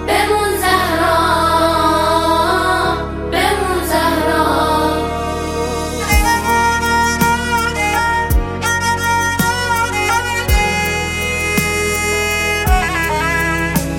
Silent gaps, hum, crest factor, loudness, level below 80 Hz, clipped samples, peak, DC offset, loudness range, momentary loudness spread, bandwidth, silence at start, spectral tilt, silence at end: none; none; 14 dB; -15 LUFS; -26 dBFS; under 0.1%; 0 dBFS; under 0.1%; 2 LU; 4 LU; 17 kHz; 0 s; -4 dB/octave; 0 s